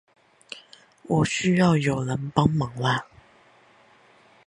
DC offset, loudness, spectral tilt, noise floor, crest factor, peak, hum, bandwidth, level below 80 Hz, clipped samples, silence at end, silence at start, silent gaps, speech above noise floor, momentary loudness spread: under 0.1%; -23 LUFS; -6 dB/octave; -56 dBFS; 22 dB; -4 dBFS; none; 11 kHz; -52 dBFS; under 0.1%; 1.45 s; 0.5 s; none; 34 dB; 21 LU